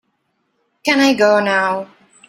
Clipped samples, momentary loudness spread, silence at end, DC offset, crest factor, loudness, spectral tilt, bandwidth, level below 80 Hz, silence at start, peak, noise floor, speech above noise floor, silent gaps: under 0.1%; 12 LU; 0.45 s; under 0.1%; 16 dB; -15 LUFS; -4 dB/octave; 15 kHz; -64 dBFS; 0.85 s; -2 dBFS; -67 dBFS; 53 dB; none